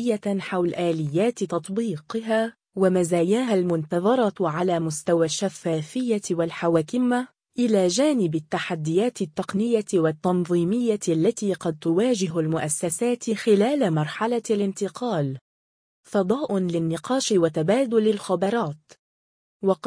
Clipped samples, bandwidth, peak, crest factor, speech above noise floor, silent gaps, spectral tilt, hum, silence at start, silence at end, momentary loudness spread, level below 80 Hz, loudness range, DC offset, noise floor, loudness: under 0.1%; 10.5 kHz; -8 dBFS; 16 dB; over 67 dB; 15.41-16.03 s, 18.99-19.60 s; -5.5 dB/octave; none; 0 s; 0.1 s; 6 LU; -66 dBFS; 2 LU; under 0.1%; under -90 dBFS; -24 LUFS